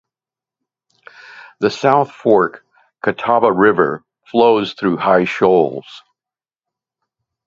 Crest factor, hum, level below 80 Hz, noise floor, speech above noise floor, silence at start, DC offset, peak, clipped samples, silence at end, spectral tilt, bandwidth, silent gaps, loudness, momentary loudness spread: 18 dB; none; -58 dBFS; under -90 dBFS; over 76 dB; 1.35 s; under 0.1%; 0 dBFS; under 0.1%; 1.45 s; -6.5 dB/octave; 7.6 kHz; none; -15 LUFS; 8 LU